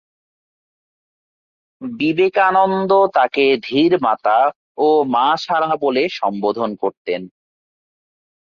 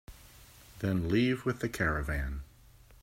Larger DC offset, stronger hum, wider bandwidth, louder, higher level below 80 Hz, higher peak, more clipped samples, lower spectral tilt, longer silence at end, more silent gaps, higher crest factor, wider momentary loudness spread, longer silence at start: neither; neither; second, 7 kHz vs 16 kHz; first, -17 LUFS vs -32 LUFS; second, -64 dBFS vs -44 dBFS; first, -2 dBFS vs -16 dBFS; neither; about the same, -6 dB/octave vs -6.5 dB/octave; first, 1.25 s vs 0.1 s; first, 4.56-4.75 s, 6.97-7.05 s vs none; about the same, 16 dB vs 18 dB; second, 9 LU vs 17 LU; first, 1.8 s vs 0.1 s